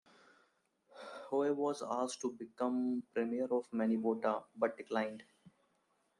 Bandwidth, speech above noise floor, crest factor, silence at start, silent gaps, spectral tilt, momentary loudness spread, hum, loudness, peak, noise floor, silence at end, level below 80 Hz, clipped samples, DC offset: 11 kHz; 41 dB; 20 dB; 0.95 s; none; -5 dB/octave; 8 LU; none; -37 LUFS; -18 dBFS; -78 dBFS; 0.7 s; -86 dBFS; under 0.1%; under 0.1%